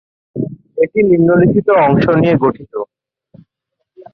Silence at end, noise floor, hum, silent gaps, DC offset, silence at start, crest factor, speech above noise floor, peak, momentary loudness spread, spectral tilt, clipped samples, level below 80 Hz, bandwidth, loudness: 1.3 s; -74 dBFS; none; none; under 0.1%; 0.35 s; 12 dB; 63 dB; -2 dBFS; 16 LU; -10.5 dB/octave; under 0.1%; -46 dBFS; 5.6 kHz; -12 LUFS